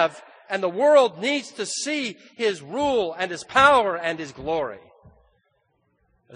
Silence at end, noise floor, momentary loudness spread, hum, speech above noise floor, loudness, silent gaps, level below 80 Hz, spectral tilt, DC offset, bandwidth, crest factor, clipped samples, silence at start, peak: 0 s; -69 dBFS; 13 LU; none; 47 dB; -22 LUFS; none; -58 dBFS; -3 dB/octave; under 0.1%; 10 kHz; 22 dB; under 0.1%; 0 s; -2 dBFS